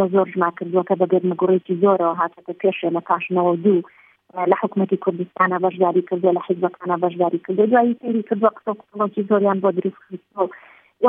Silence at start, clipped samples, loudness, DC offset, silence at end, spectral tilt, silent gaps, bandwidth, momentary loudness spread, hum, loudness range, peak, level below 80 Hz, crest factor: 0 s; under 0.1%; -20 LUFS; under 0.1%; 0 s; -11 dB/octave; none; 3.7 kHz; 8 LU; none; 1 LU; -2 dBFS; -76 dBFS; 18 dB